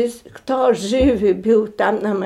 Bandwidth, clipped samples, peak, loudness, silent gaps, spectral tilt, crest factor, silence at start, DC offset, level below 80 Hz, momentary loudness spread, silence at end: 13 kHz; under 0.1%; -4 dBFS; -17 LUFS; none; -6 dB/octave; 12 dB; 0 s; under 0.1%; -38 dBFS; 8 LU; 0 s